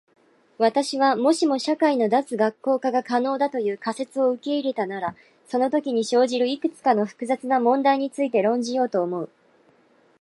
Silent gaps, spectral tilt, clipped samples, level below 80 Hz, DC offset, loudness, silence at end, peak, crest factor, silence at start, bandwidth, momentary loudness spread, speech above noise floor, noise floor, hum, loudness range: none; -4.5 dB/octave; under 0.1%; -76 dBFS; under 0.1%; -23 LUFS; 0.95 s; -6 dBFS; 18 dB; 0.6 s; 11.5 kHz; 7 LU; 37 dB; -59 dBFS; none; 3 LU